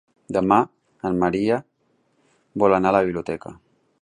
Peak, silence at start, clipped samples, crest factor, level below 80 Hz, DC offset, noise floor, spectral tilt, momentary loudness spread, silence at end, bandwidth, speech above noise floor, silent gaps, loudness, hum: -4 dBFS; 0.3 s; under 0.1%; 18 dB; -54 dBFS; under 0.1%; -66 dBFS; -7.5 dB/octave; 13 LU; 0.5 s; 10.5 kHz; 46 dB; none; -21 LUFS; none